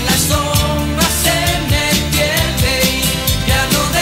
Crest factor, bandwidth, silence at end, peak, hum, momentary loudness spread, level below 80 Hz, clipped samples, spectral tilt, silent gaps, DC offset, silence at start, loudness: 14 dB; 16.5 kHz; 0 s; -2 dBFS; none; 2 LU; -24 dBFS; under 0.1%; -3.5 dB/octave; none; under 0.1%; 0 s; -14 LUFS